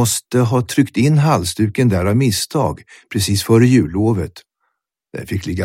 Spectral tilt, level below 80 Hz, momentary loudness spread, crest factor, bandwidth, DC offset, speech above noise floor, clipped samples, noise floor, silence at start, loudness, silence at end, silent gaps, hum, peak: -5.5 dB/octave; -44 dBFS; 12 LU; 16 dB; 16.5 kHz; under 0.1%; 56 dB; under 0.1%; -71 dBFS; 0 s; -16 LUFS; 0 s; none; none; 0 dBFS